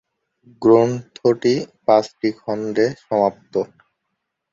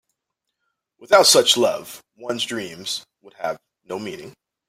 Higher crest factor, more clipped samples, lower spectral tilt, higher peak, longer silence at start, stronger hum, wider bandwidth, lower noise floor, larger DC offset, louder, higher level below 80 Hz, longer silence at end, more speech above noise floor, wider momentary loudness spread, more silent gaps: about the same, 18 dB vs 20 dB; neither; first, -6.5 dB/octave vs -1.5 dB/octave; about the same, -2 dBFS vs -2 dBFS; second, 0.6 s vs 1 s; neither; second, 7.6 kHz vs 16 kHz; about the same, -77 dBFS vs -80 dBFS; neither; about the same, -19 LUFS vs -18 LUFS; first, -62 dBFS vs -68 dBFS; first, 0.9 s vs 0.4 s; about the same, 59 dB vs 60 dB; second, 10 LU vs 22 LU; neither